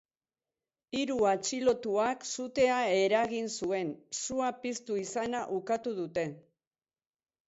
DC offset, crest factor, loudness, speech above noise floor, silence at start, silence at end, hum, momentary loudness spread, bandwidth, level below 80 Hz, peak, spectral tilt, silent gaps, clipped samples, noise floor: under 0.1%; 18 dB; -31 LUFS; over 59 dB; 0.9 s; 1.1 s; none; 9 LU; 8.2 kHz; -68 dBFS; -14 dBFS; -3.5 dB/octave; none; under 0.1%; under -90 dBFS